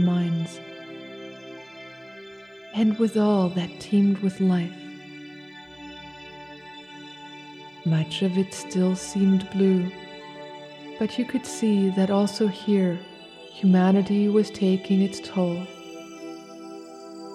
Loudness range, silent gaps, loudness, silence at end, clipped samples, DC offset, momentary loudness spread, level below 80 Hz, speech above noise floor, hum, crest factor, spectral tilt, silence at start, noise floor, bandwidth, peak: 8 LU; none; -24 LUFS; 0 s; under 0.1%; under 0.1%; 20 LU; -66 dBFS; 21 dB; none; 16 dB; -7 dB/octave; 0 s; -43 dBFS; 11 kHz; -10 dBFS